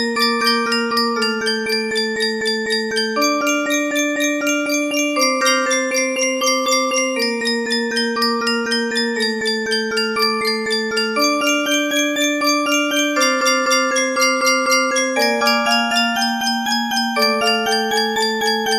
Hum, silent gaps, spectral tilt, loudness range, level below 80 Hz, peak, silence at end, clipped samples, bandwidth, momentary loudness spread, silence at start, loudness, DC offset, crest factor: none; none; -1 dB/octave; 3 LU; -64 dBFS; -2 dBFS; 0 s; under 0.1%; 16 kHz; 4 LU; 0 s; -17 LUFS; under 0.1%; 16 dB